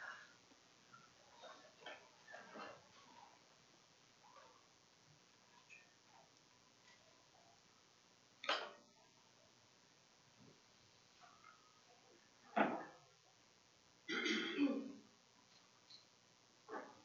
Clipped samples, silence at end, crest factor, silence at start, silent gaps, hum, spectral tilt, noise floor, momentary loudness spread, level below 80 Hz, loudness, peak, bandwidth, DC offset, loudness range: under 0.1%; 0.05 s; 30 dB; 0 s; none; none; -1.5 dB/octave; -71 dBFS; 28 LU; under -90 dBFS; -45 LUFS; -22 dBFS; 7.4 kHz; under 0.1%; 22 LU